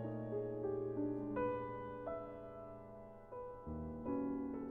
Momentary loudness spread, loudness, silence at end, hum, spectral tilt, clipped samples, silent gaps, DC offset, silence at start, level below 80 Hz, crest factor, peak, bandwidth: 13 LU; -44 LUFS; 0 s; none; -9 dB/octave; under 0.1%; none; under 0.1%; 0 s; -62 dBFS; 16 dB; -28 dBFS; 3.7 kHz